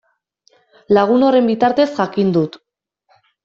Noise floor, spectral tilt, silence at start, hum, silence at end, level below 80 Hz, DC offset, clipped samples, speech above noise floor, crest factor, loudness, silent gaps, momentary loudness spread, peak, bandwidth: -62 dBFS; -7.5 dB/octave; 0.9 s; none; 0.9 s; -60 dBFS; under 0.1%; under 0.1%; 48 dB; 16 dB; -15 LUFS; none; 5 LU; -2 dBFS; 7.4 kHz